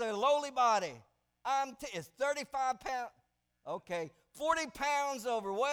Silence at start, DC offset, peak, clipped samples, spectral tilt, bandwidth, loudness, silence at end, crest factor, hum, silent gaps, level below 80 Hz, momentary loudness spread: 0 s; under 0.1%; -18 dBFS; under 0.1%; -2.5 dB/octave; 18.5 kHz; -35 LUFS; 0 s; 18 dB; none; none; -70 dBFS; 14 LU